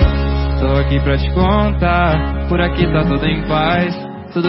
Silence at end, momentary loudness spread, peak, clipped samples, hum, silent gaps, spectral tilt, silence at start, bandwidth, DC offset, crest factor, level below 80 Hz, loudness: 0 s; 4 LU; 0 dBFS; under 0.1%; none; none; -5.5 dB/octave; 0 s; 5.8 kHz; under 0.1%; 14 dB; -20 dBFS; -16 LUFS